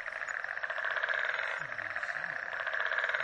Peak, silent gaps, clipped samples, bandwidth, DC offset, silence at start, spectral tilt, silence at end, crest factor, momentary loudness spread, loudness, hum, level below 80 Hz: -16 dBFS; none; under 0.1%; 10.5 kHz; under 0.1%; 0 s; -1.5 dB/octave; 0 s; 18 dB; 5 LU; -34 LUFS; none; -76 dBFS